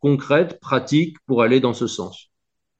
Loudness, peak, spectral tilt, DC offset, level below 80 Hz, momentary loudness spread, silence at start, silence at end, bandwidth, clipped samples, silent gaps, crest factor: -19 LUFS; -2 dBFS; -6 dB/octave; under 0.1%; -64 dBFS; 9 LU; 0.05 s; 0.6 s; 8.4 kHz; under 0.1%; none; 18 dB